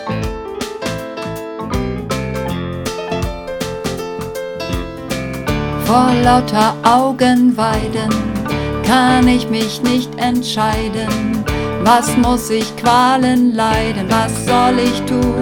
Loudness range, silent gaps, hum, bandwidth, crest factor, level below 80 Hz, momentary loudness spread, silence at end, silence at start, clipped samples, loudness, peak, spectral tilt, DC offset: 8 LU; none; none; 18.5 kHz; 16 dB; -32 dBFS; 12 LU; 0 s; 0 s; under 0.1%; -16 LUFS; 0 dBFS; -5 dB/octave; under 0.1%